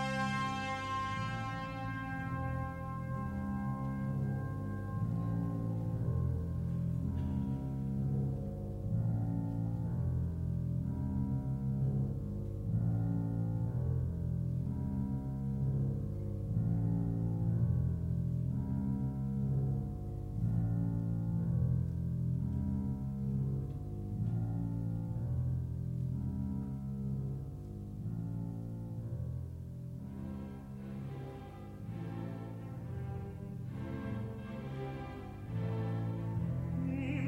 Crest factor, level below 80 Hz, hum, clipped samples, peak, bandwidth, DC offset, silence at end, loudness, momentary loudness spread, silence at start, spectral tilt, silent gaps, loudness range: 14 dB; -48 dBFS; none; under 0.1%; -20 dBFS; 8.8 kHz; under 0.1%; 0 s; -37 LUFS; 9 LU; 0 s; -8.5 dB/octave; none; 8 LU